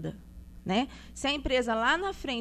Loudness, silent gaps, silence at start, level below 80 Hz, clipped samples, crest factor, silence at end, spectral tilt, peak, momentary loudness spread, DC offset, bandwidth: -29 LUFS; none; 0 s; -46 dBFS; under 0.1%; 18 dB; 0 s; -4 dB/octave; -12 dBFS; 14 LU; under 0.1%; 14 kHz